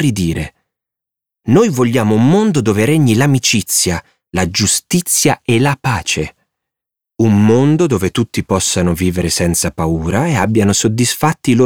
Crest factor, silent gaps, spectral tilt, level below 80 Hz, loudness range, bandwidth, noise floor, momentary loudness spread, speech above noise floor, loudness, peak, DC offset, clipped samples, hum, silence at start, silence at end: 14 dB; none; -4.5 dB/octave; -38 dBFS; 2 LU; over 20 kHz; -84 dBFS; 7 LU; 71 dB; -13 LUFS; 0 dBFS; 0.4%; under 0.1%; none; 0 s; 0 s